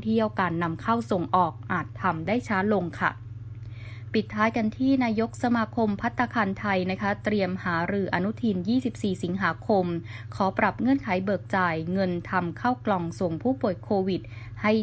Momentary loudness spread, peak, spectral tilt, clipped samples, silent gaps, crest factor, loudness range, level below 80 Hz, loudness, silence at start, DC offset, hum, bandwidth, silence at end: 5 LU; -8 dBFS; -7.5 dB/octave; under 0.1%; none; 18 dB; 1 LU; -52 dBFS; -26 LUFS; 0 s; under 0.1%; none; 8 kHz; 0 s